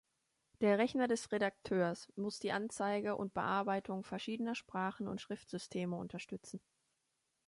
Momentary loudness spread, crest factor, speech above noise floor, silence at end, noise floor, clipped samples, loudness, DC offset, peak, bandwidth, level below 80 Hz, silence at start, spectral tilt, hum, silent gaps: 11 LU; 20 dB; 46 dB; 0.9 s; -84 dBFS; under 0.1%; -38 LUFS; under 0.1%; -18 dBFS; 11.5 kHz; -74 dBFS; 0.6 s; -5.5 dB/octave; none; none